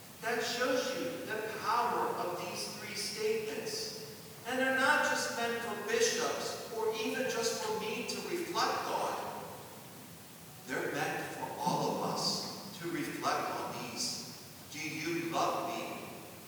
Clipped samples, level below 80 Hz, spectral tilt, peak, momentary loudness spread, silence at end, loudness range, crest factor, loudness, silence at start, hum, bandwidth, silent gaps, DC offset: under 0.1%; -76 dBFS; -2.5 dB/octave; -16 dBFS; 13 LU; 0 s; 5 LU; 20 dB; -35 LUFS; 0 s; none; over 20 kHz; none; under 0.1%